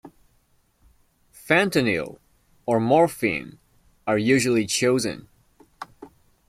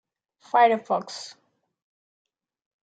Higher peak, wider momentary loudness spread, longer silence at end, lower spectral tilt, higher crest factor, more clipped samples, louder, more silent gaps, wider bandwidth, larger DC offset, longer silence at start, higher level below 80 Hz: about the same, -4 dBFS vs -6 dBFS; first, 22 LU vs 18 LU; second, 0.4 s vs 1.55 s; about the same, -4.5 dB/octave vs -3.5 dB/octave; about the same, 22 dB vs 22 dB; neither; about the same, -22 LUFS vs -22 LUFS; neither; first, 16 kHz vs 9.2 kHz; neither; second, 0.05 s vs 0.55 s; first, -60 dBFS vs -88 dBFS